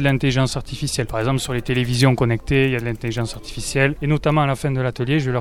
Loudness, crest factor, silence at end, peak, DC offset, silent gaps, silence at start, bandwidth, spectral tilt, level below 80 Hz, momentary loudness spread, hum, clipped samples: -20 LUFS; 18 dB; 0 s; -2 dBFS; under 0.1%; none; 0 s; 15.5 kHz; -5.5 dB/octave; -36 dBFS; 8 LU; none; under 0.1%